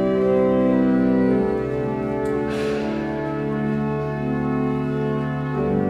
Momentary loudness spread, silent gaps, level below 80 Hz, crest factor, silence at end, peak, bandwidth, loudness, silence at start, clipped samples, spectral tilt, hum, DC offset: 6 LU; none; -44 dBFS; 14 dB; 0 s; -8 dBFS; 10.5 kHz; -22 LUFS; 0 s; under 0.1%; -9 dB/octave; none; under 0.1%